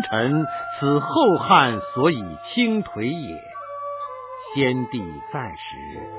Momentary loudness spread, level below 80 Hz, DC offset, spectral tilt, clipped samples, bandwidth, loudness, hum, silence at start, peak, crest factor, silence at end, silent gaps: 18 LU; -54 dBFS; under 0.1%; -10 dB/octave; under 0.1%; 4 kHz; -22 LUFS; none; 0 s; -2 dBFS; 20 dB; 0 s; none